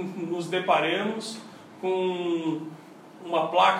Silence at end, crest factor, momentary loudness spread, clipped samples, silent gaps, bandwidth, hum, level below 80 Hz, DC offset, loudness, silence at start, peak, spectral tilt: 0 s; 20 dB; 18 LU; under 0.1%; none; 13 kHz; none; -86 dBFS; under 0.1%; -27 LUFS; 0 s; -6 dBFS; -5 dB/octave